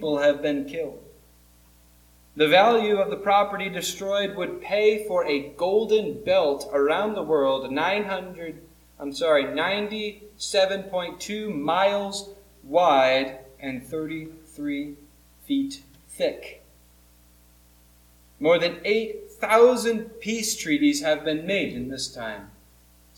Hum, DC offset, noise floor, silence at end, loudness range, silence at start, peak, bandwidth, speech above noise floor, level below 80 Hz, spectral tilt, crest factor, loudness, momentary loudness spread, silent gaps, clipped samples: 60 Hz at -55 dBFS; under 0.1%; -55 dBFS; 0.7 s; 9 LU; 0 s; -6 dBFS; 18.5 kHz; 32 dB; -58 dBFS; -3.5 dB/octave; 20 dB; -24 LUFS; 15 LU; none; under 0.1%